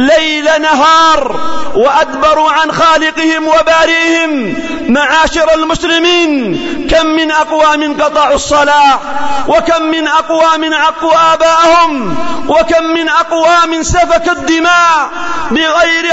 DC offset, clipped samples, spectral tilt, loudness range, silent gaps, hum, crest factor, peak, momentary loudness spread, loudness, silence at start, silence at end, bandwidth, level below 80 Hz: under 0.1%; under 0.1%; -3 dB/octave; 1 LU; none; none; 8 dB; 0 dBFS; 7 LU; -9 LUFS; 0 s; 0 s; 8 kHz; -32 dBFS